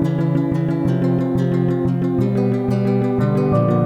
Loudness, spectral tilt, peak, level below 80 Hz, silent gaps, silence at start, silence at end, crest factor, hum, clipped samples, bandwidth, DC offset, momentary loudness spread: -18 LUFS; -10 dB/octave; -6 dBFS; -44 dBFS; none; 0 s; 0 s; 12 dB; none; under 0.1%; 8 kHz; 0.1%; 2 LU